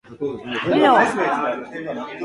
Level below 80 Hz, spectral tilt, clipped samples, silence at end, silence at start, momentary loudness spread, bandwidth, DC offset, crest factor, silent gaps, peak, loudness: -60 dBFS; -5 dB/octave; under 0.1%; 0 s; 0.1 s; 14 LU; 11.5 kHz; under 0.1%; 18 dB; none; -2 dBFS; -19 LUFS